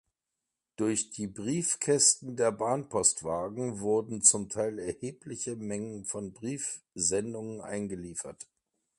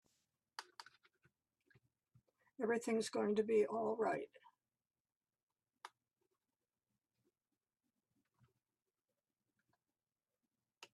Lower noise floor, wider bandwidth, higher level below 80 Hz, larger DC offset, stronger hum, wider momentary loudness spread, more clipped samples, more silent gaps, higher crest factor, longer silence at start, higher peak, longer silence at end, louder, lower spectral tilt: about the same, -87 dBFS vs under -90 dBFS; about the same, 11.5 kHz vs 12 kHz; first, -64 dBFS vs -90 dBFS; neither; neither; second, 16 LU vs 24 LU; neither; second, none vs 5.00-5.05 s, 5.16-5.21 s, 5.43-5.47 s; about the same, 24 dB vs 20 dB; first, 0.8 s vs 0.6 s; first, -6 dBFS vs -26 dBFS; first, 0.55 s vs 0.1 s; first, -30 LUFS vs -39 LUFS; second, -3 dB/octave vs -5 dB/octave